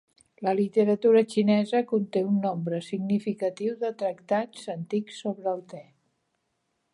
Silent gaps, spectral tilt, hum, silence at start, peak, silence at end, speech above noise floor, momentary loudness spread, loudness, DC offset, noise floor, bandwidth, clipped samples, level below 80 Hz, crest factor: none; -7 dB/octave; none; 0.4 s; -10 dBFS; 1.1 s; 51 dB; 12 LU; -27 LUFS; under 0.1%; -77 dBFS; 11 kHz; under 0.1%; -76 dBFS; 16 dB